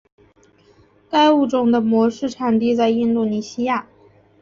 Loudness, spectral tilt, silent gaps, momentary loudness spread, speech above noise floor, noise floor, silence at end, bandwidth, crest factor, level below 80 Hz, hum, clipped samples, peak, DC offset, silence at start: -18 LUFS; -6 dB/octave; none; 8 LU; 37 dB; -54 dBFS; 0.6 s; 7.4 kHz; 16 dB; -60 dBFS; none; under 0.1%; -4 dBFS; under 0.1%; 1.1 s